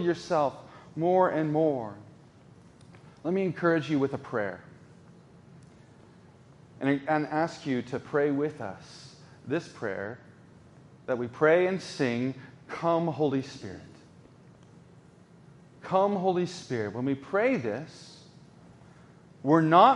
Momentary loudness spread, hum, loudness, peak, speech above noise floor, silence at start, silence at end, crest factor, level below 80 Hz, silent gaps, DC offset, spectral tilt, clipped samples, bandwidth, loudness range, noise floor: 21 LU; none; -28 LUFS; -6 dBFS; 28 dB; 0 s; 0 s; 24 dB; -70 dBFS; none; under 0.1%; -7 dB/octave; under 0.1%; 11 kHz; 5 LU; -55 dBFS